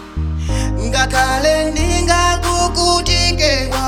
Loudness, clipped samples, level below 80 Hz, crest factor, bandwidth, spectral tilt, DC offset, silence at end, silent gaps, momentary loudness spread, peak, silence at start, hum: -15 LUFS; under 0.1%; -22 dBFS; 14 dB; 17 kHz; -3.5 dB/octave; under 0.1%; 0 s; none; 7 LU; 0 dBFS; 0 s; none